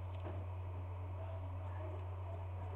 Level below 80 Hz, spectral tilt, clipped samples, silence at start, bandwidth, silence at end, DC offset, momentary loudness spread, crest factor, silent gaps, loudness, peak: -58 dBFS; -9 dB/octave; under 0.1%; 0 s; 3.8 kHz; 0 s; under 0.1%; 1 LU; 10 dB; none; -46 LUFS; -34 dBFS